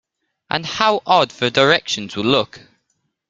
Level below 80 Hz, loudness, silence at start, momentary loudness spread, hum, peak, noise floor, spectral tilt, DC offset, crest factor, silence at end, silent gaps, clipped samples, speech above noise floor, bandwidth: -58 dBFS; -17 LUFS; 0.5 s; 9 LU; none; 0 dBFS; -70 dBFS; -4 dB/octave; under 0.1%; 18 dB; 0.7 s; none; under 0.1%; 53 dB; 9.2 kHz